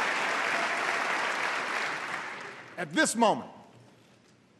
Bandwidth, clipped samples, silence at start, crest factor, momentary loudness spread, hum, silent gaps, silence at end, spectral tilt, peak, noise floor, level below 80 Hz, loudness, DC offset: 12.5 kHz; under 0.1%; 0 s; 22 dB; 13 LU; none; none; 0.75 s; -2.5 dB/octave; -10 dBFS; -60 dBFS; -84 dBFS; -29 LUFS; under 0.1%